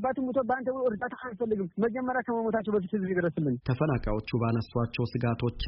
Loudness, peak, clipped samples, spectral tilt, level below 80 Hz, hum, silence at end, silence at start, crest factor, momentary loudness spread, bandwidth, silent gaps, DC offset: -30 LUFS; -14 dBFS; under 0.1%; -6.5 dB/octave; -46 dBFS; none; 0 s; 0 s; 14 dB; 3 LU; 5.8 kHz; none; under 0.1%